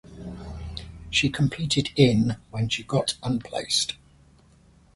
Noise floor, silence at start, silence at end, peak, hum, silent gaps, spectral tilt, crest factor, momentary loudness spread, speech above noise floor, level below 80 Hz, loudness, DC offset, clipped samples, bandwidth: -56 dBFS; 0.05 s; 1 s; -2 dBFS; none; none; -4.5 dB/octave; 24 dB; 18 LU; 32 dB; -46 dBFS; -24 LUFS; under 0.1%; under 0.1%; 11.5 kHz